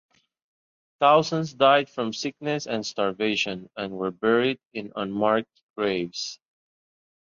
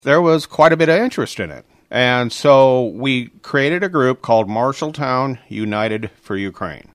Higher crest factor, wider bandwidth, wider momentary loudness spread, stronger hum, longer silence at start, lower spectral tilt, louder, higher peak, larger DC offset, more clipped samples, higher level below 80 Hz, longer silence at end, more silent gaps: first, 22 dB vs 16 dB; second, 7.6 kHz vs 14 kHz; about the same, 14 LU vs 13 LU; neither; first, 1 s vs 0.05 s; second, -4.5 dB/octave vs -6 dB/octave; second, -25 LUFS vs -16 LUFS; second, -4 dBFS vs 0 dBFS; neither; neither; second, -66 dBFS vs -56 dBFS; first, 1 s vs 0.15 s; first, 4.66-4.71 s, 5.63-5.74 s vs none